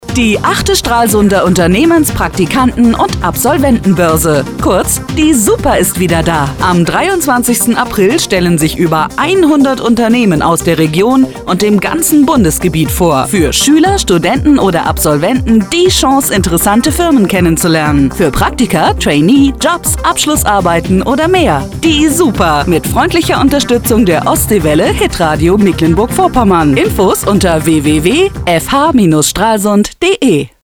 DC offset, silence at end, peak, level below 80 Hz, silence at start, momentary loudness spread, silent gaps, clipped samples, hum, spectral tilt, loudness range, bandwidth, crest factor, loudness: 0.2%; 0.15 s; 0 dBFS; -26 dBFS; 0 s; 3 LU; none; under 0.1%; none; -4.5 dB/octave; 1 LU; over 20 kHz; 8 dB; -9 LUFS